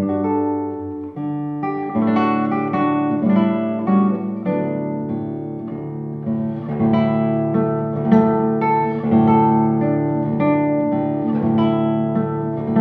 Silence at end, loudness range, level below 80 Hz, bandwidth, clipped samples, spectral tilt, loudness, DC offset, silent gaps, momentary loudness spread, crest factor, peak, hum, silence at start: 0 s; 5 LU; -56 dBFS; 4.7 kHz; under 0.1%; -11 dB/octave; -19 LUFS; under 0.1%; none; 10 LU; 16 dB; -2 dBFS; none; 0 s